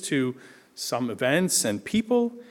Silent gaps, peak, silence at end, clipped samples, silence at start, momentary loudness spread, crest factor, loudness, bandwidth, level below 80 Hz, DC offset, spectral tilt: none; -8 dBFS; 0.05 s; under 0.1%; 0 s; 9 LU; 18 dB; -25 LUFS; 18 kHz; -64 dBFS; under 0.1%; -3.5 dB/octave